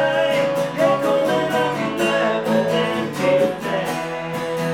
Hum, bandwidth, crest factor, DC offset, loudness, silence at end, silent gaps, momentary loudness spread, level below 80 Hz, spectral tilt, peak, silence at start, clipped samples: none; 17.5 kHz; 14 dB; under 0.1%; -20 LUFS; 0 s; none; 6 LU; -58 dBFS; -5 dB/octave; -6 dBFS; 0 s; under 0.1%